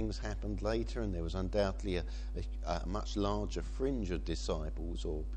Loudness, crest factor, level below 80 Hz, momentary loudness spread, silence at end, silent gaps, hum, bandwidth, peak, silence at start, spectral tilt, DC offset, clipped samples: -38 LUFS; 16 dB; -40 dBFS; 6 LU; 0 s; none; none; 9 kHz; -20 dBFS; 0 s; -6 dB/octave; under 0.1%; under 0.1%